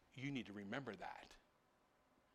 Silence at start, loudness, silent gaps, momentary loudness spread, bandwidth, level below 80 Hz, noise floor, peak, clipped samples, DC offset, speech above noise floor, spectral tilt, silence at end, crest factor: 0.1 s; -50 LUFS; none; 15 LU; 13.5 kHz; -78 dBFS; -78 dBFS; -30 dBFS; under 0.1%; under 0.1%; 27 dB; -6 dB/octave; 0.95 s; 22 dB